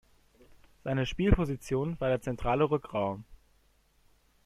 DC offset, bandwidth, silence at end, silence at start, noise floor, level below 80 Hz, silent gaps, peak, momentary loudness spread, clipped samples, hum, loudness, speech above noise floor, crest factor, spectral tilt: under 0.1%; 13.5 kHz; 1.1 s; 0.85 s; -67 dBFS; -42 dBFS; none; -10 dBFS; 7 LU; under 0.1%; none; -31 LUFS; 38 dB; 22 dB; -7 dB/octave